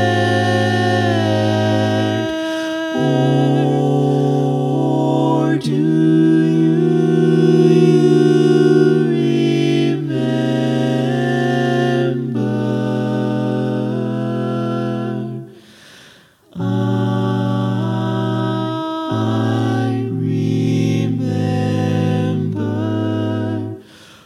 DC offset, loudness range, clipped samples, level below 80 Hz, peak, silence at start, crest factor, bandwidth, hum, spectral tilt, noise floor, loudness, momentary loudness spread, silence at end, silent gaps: under 0.1%; 8 LU; under 0.1%; -62 dBFS; -2 dBFS; 0 s; 14 dB; 12.5 kHz; none; -7.5 dB/octave; -47 dBFS; -17 LUFS; 8 LU; 0.45 s; none